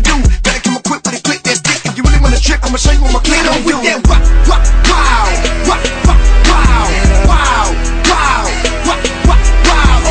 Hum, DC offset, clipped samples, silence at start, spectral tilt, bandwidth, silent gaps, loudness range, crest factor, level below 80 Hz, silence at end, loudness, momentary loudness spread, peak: none; under 0.1%; 0.2%; 0 s; -4 dB/octave; 9.6 kHz; none; 1 LU; 8 dB; -10 dBFS; 0 s; -11 LUFS; 4 LU; 0 dBFS